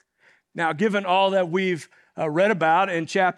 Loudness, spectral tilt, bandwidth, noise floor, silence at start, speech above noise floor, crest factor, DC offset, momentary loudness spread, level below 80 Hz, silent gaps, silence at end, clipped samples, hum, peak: -22 LUFS; -5.5 dB/octave; 11 kHz; -61 dBFS; 0.55 s; 39 dB; 16 dB; under 0.1%; 11 LU; -80 dBFS; none; 0.05 s; under 0.1%; none; -6 dBFS